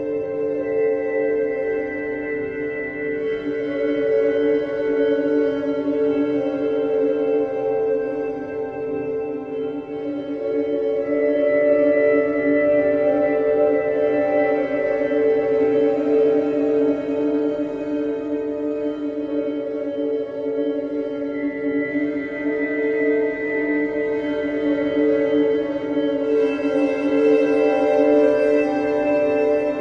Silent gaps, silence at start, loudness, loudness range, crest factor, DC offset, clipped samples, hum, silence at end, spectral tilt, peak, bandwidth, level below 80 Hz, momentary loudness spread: none; 0 s; -21 LUFS; 6 LU; 14 dB; under 0.1%; under 0.1%; none; 0 s; -7.5 dB/octave; -6 dBFS; 6.2 kHz; -56 dBFS; 8 LU